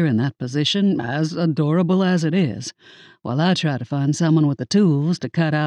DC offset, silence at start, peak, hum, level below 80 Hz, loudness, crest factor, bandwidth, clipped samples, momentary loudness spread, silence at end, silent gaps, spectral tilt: under 0.1%; 0 s; -8 dBFS; none; -64 dBFS; -20 LUFS; 12 dB; 9.8 kHz; under 0.1%; 6 LU; 0 s; none; -6.5 dB/octave